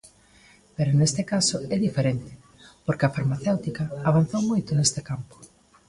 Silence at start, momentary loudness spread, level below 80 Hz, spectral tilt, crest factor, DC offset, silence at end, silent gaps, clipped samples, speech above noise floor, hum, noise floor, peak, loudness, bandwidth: 0.8 s; 13 LU; -54 dBFS; -5 dB/octave; 18 dB; under 0.1%; 0.45 s; none; under 0.1%; 31 dB; none; -55 dBFS; -6 dBFS; -24 LUFS; 11.5 kHz